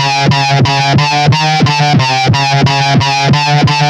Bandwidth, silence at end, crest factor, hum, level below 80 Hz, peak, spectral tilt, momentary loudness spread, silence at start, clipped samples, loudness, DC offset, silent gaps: 9.6 kHz; 0 s; 8 dB; none; -38 dBFS; 0 dBFS; -5 dB/octave; 1 LU; 0 s; under 0.1%; -9 LUFS; under 0.1%; none